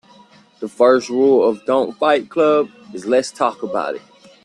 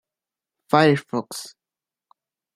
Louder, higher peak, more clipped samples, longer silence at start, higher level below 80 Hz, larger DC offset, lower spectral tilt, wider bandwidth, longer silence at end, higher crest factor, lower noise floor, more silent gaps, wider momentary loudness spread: first, -17 LUFS vs -20 LUFS; about the same, -2 dBFS vs -2 dBFS; neither; about the same, 0.6 s vs 0.7 s; about the same, -66 dBFS vs -68 dBFS; neither; about the same, -4.5 dB/octave vs -5.5 dB/octave; second, 11 kHz vs 15.5 kHz; second, 0.45 s vs 1.1 s; second, 16 dB vs 24 dB; second, -48 dBFS vs -90 dBFS; neither; second, 14 LU vs 18 LU